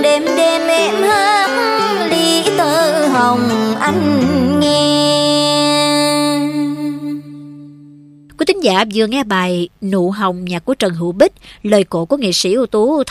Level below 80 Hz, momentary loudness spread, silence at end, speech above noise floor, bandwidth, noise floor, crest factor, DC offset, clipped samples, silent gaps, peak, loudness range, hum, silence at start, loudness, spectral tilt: -50 dBFS; 7 LU; 0 s; 26 dB; 15.5 kHz; -41 dBFS; 14 dB; under 0.1%; under 0.1%; none; 0 dBFS; 5 LU; none; 0 s; -14 LUFS; -4 dB/octave